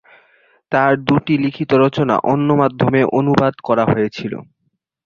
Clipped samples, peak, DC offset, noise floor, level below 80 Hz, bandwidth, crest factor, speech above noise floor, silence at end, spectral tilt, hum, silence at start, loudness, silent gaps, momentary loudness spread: under 0.1%; -2 dBFS; under 0.1%; -69 dBFS; -50 dBFS; 7 kHz; 14 dB; 54 dB; 0.65 s; -8 dB/octave; none; 0.7 s; -16 LUFS; none; 6 LU